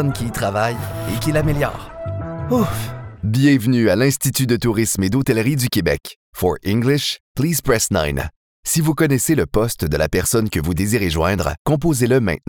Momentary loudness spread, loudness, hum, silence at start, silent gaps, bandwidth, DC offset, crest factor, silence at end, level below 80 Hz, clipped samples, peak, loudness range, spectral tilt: 10 LU; -18 LUFS; none; 0 s; 6.16-6.33 s, 7.20-7.35 s, 8.36-8.63 s, 11.59-11.65 s; over 20 kHz; under 0.1%; 16 dB; 0.1 s; -36 dBFS; under 0.1%; -4 dBFS; 2 LU; -5 dB/octave